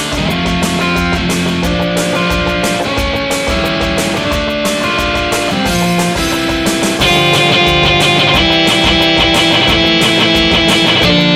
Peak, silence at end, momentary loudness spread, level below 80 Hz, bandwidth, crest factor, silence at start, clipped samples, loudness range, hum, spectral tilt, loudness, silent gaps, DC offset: 0 dBFS; 0 s; 6 LU; -26 dBFS; 16 kHz; 12 dB; 0 s; under 0.1%; 5 LU; none; -4 dB/octave; -11 LUFS; none; 0.1%